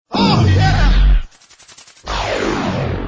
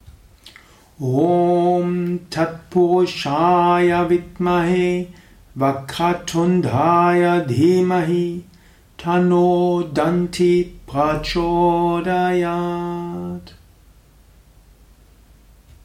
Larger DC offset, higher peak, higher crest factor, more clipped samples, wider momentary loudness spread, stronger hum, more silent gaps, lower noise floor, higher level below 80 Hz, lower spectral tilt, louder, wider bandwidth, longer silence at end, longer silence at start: neither; first, 0 dBFS vs -4 dBFS; about the same, 14 dB vs 14 dB; neither; about the same, 10 LU vs 10 LU; neither; neither; second, -44 dBFS vs -49 dBFS; first, -18 dBFS vs -44 dBFS; about the same, -6 dB/octave vs -7 dB/octave; about the same, -16 LUFS vs -18 LUFS; second, 8 kHz vs 13 kHz; second, 0 s vs 2.35 s; about the same, 0.1 s vs 0.1 s